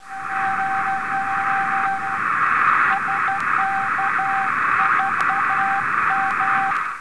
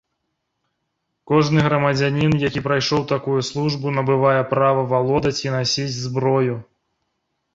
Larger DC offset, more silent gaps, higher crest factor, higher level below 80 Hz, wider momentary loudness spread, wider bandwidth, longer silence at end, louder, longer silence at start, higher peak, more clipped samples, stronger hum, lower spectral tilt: first, 0.8% vs under 0.1%; neither; about the same, 14 dB vs 18 dB; second, -60 dBFS vs -50 dBFS; about the same, 5 LU vs 5 LU; first, 11 kHz vs 7.8 kHz; second, 0 s vs 0.95 s; about the same, -19 LUFS vs -19 LUFS; second, 0 s vs 1.3 s; second, -6 dBFS vs -2 dBFS; neither; neither; second, -3.5 dB/octave vs -6 dB/octave